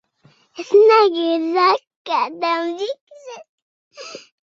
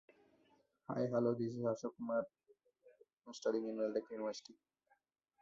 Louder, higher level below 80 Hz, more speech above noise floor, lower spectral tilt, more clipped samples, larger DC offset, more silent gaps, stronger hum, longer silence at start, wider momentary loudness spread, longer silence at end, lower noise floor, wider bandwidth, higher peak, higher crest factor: first, -17 LUFS vs -40 LUFS; first, -74 dBFS vs -84 dBFS; about the same, 39 dB vs 40 dB; second, -3 dB/octave vs -6.5 dB/octave; neither; neither; first, 1.96-2.05 s, 3.01-3.07 s, 3.49-3.91 s vs none; neither; second, 0.55 s vs 0.9 s; first, 25 LU vs 15 LU; second, 0.3 s vs 0.9 s; second, -56 dBFS vs -80 dBFS; about the same, 7.4 kHz vs 7.6 kHz; first, -2 dBFS vs -24 dBFS; about the same, 18 dB vs 18 dB